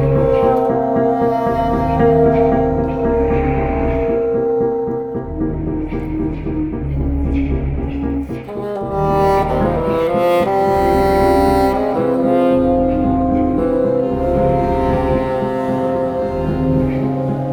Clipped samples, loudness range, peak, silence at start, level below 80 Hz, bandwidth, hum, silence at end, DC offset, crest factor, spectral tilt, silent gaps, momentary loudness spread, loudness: under 0.1%; 6 LU; -2 dBFS; 0 s; -26 dBFS; 19.5 kHz; none; 0 s; 0.2%; 14 dB; -8.5 dB/octave; none; 8 LU; -16 LUFS